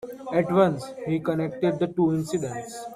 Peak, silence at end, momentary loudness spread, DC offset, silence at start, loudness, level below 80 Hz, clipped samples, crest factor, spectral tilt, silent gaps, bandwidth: -8 dBFS; 0 s; 10 LU; under 0.1%; 0 s; -25 LUFS; -62 dBFS; under 0.1%; 18 dB; -7 dB/octave; none; 14.5 kHz